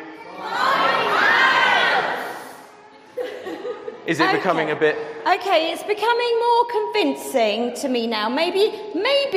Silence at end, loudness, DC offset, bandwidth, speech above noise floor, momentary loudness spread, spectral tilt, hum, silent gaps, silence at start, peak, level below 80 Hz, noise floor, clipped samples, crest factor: 0 s; -19 LUFS; under 0.1%; 15.5 kHz; 25 dB; 15 LU; -3.5 dB/octave; none; none; 0 s; -2 dBFS; -70 dBFS; -45 dBFS; under 0.1%; 18 dB